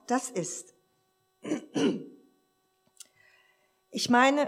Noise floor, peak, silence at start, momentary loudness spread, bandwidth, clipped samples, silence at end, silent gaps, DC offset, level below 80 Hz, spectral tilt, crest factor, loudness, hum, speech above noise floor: -73 dBFS; -10 dBFS; 0.1 s; 18 LU; 15 kHz; under 0.1%; 0 s; none; under 0.1%; -86 dBFS; -3.5 dB/octave; 22 dB; -29 LUFS; none; 45 dB